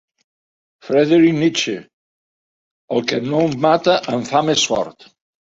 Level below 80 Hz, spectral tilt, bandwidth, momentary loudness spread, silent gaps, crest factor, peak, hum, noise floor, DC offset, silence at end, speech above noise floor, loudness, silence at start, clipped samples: -60 dBFS; -4.5 dB/octave; 7.8 kHz; 10 LU; 1.93-2.88 s; 18 dB; 0 dBFS; none; under -90 dBFS; under 0.1%; 0.6 s; over 74 dB; -17 LUFS; 0.85 s; under 0.1%